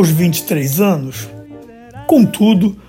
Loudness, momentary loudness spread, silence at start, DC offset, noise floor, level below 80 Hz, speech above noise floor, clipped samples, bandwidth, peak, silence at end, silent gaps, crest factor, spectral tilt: -13 LUFS; 17 LU; 0 s; under 0.1%; -36 dBFS; -48 dBFS; 23 dB; under 0.1%; 16.5 kHz; 0 dBFS; 0.1 s; none; 14 dB; -6 dB/octave